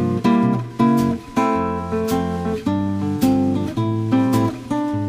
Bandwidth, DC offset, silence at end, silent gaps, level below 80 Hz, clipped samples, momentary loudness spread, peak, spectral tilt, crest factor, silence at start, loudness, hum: 15.5 kHz; under 0.1%; 0 s; none; -46 dBFS; under 0.1%; 6 LU; -4 dBFS; -7.5 dB/octave; 14 dB; 0 s; -20 LUFS; none